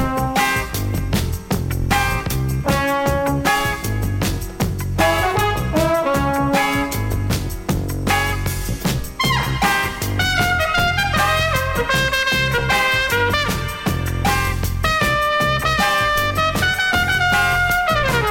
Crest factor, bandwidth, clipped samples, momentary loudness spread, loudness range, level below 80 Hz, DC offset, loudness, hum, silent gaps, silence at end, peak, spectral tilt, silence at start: 16 dB; 17 kHz; under 0.1%; 6 LU; 3 LU; -30 dBFS; under 0.1%; -18 LUFS; none; none; 0 s; -2 dBFS; -4 dB/octave; 0 s